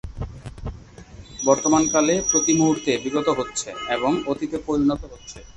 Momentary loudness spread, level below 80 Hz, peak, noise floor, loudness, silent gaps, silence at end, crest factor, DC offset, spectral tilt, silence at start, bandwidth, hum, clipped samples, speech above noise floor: 18 LU; -42 dBFS; -2 dBFS; -43 dBFS; -21 LUFS; none; 0.05 s; 20 dB; under 0.1%; -3.5 dB/octave; 0.05 s; 8.6 kHz; none; under 0.1%; 21 dB